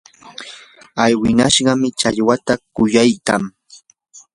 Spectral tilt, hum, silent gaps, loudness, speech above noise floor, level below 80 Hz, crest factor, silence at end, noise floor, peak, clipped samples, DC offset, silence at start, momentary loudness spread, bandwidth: -4 dB/octave; none; none; -15 LUFS; 32 dB; -48 dBFS; 18 dB; 0.15 s; -47 dBFS; 0 dBFS; under 0.1%; under 0.1%; 0.25 s; 20 LU; 11.5 kHz